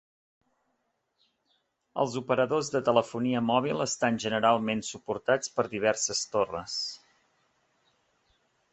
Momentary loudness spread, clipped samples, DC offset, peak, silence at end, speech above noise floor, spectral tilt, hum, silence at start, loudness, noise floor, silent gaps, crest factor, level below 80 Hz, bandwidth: 8 LU; under 0.1%; under 0.1%; -8 dBFS; 1.75 s; 49 dB; -3.5 dB/octave; none; 1.95 s; -28 LUFS; -77 dBFS; none; 24 dB; -68 dBFS; 8.4 kHz